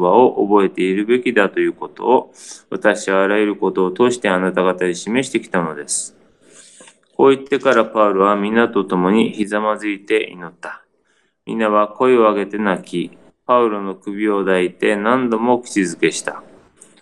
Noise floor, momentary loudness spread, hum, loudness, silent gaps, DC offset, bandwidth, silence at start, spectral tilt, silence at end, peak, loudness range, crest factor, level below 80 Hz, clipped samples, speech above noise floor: -63 dBFS; 12 LU; none; -17 LUFS; none; 0.1%; 11.5 kHz; 0 s; -5 dB/octave; 0.6 s; 0 dBFS; 3 LU; 18 dB; -64 dBFS; under 0.1%; 46 dB